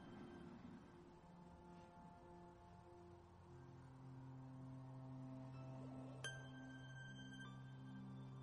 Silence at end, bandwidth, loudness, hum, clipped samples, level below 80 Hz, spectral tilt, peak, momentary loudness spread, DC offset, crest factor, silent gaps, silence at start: 0 s; 11 kHz; -58 LUFS; none; under 0.1%; -76 dBFS; -5.5 dB/octave; -34 dBFS; 9 LU; under 0.1%; 22 dB; none; 0 s